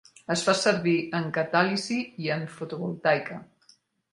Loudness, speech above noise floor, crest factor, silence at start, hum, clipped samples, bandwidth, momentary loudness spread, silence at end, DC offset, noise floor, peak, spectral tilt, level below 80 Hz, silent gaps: -26 LUFS; 35 dB; 22 dB; 0.3 s; none; under 0.1%; 11.5 kHz; 11 LU; 0.7 s; under 0.1%; -62 dBFS; -6 dBFS; -4.5 dB/octave; -70 dBFS; none